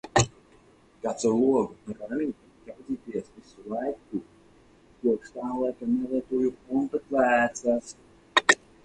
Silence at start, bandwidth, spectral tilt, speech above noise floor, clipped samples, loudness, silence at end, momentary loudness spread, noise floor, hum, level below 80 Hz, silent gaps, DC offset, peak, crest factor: 0.05 s; 11 kHz; -4 dB/octave; 30 dB; under 0.1%; -27 LUFS; 0.3 s; 14 LU; -57 dBFS; none; -56 dBFS; none; under 0.1%; -4 dBFS; 24 dB